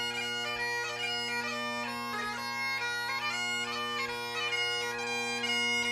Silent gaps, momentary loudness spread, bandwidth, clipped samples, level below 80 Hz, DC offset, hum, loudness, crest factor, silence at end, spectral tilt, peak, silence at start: none; 5 LU; 15.5 kHz; under 0.1%; -70 dBFS; under 0.1%; none; -32 LUFS; 14 dB; 0 s; -1.5 dB/octave; -20 dBFS; 0 s